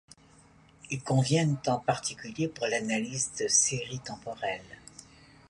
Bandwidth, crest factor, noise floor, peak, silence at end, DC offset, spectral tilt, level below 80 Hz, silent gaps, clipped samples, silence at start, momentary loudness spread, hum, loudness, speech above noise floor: 11.5 kHz; 20 dB; -58 dBFS; -12 dBFS; 0.45 s; under 0.1%; -3.5 dB/octave; -64 dBFS; none; under 0.1%; 0.85 s; 16 LU; none; -29 LUFS; 29 dB